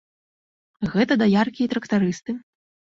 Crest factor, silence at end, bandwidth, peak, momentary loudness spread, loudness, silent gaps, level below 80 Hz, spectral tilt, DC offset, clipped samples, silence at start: 18 dB; 0.6 s; 7.6 kHz; -4 dBFS; 13 LU; -22 LUFS; none; -58 dBFS; -6.5 dB/octave; under 0.1%; under 0.1%; 0.8 s